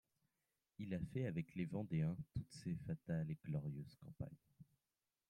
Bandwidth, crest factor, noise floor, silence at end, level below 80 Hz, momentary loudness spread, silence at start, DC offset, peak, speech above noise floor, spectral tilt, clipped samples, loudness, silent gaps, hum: 10.5 kHz; 16 dB; under -90 dBFS; 0.65 s; -70 dBFS; 12 LU; 0.8 s; under 0.1%; -30 dBFS; over 45 dB; -8.5 dB/octave; under 0.1%; -46 LUFS; none; none